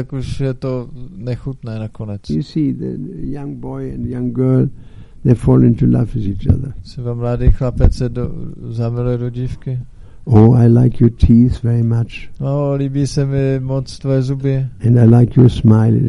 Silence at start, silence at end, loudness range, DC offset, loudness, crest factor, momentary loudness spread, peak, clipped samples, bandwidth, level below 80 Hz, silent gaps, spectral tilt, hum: 0 s; 0 s; 9 LU; under 0.1%; -15 LUFS; 14 dB; 16 LU; 0 dBFS; under 0.1%; 10.5 kHz; -26 dBFS; none; -9.5 dB/octave; none